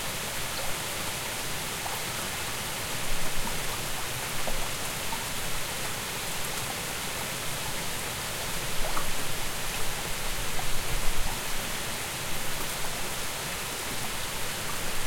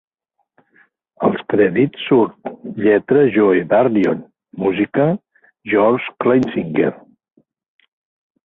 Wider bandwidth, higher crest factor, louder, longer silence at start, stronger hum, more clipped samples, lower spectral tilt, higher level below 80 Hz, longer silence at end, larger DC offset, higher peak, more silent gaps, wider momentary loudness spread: first, 17 kHz vs 4.8 kHz; about the same, 18 dB vs 16 dB; second, -31 LUFS vs -16 LUFS; second, 0 s vs 1.2 s; neither; neither; second, -2 dB/octave vs -9 dB/octave; first, -38 dBFS vs -58 dBFS; second, 0 s vs 1.5 s; neither; second, -10 dBFS vs -2 dBFS; neither; second, 1 LU vs 9 LU